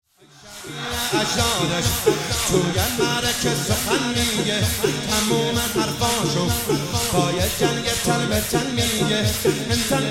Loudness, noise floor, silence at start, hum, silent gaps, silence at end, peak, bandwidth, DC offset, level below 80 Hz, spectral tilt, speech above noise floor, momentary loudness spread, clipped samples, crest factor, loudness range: -20 LUFS; -46 dBFS; 0.45 s; none; none; 0 s; -4 dBFS; 16.5 kHz; under 0.1%; -38 dBFS; -3.5 dB/octave; 25 dB; 2 LU; under 0.1%; 16 dB; 1 LU